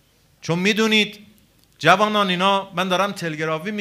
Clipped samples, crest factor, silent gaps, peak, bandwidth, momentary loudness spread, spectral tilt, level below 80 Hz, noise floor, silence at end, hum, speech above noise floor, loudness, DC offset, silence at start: under 0.1%; 20 dB; none; 0 dBFS; 15.5 kHz; 9 LU; -4.5 dB/octave; -64 dBFS; -55 dBFS; 0 s; none; 36 dB; -19 LUFS; under 0.1%; 0.45 s